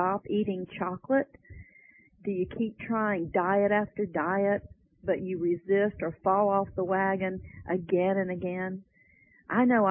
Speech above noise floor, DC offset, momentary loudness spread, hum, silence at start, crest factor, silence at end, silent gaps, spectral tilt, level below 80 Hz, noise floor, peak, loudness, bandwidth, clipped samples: 34 dB; under 0.1%; 9 LU; none; 0 s; 16 dB; 0 s; none; -11 dB/octave; -58 dBFS; -62 dBFS; -12 dBFS; -29 LUFS; 3.5 kHz; under 0.1%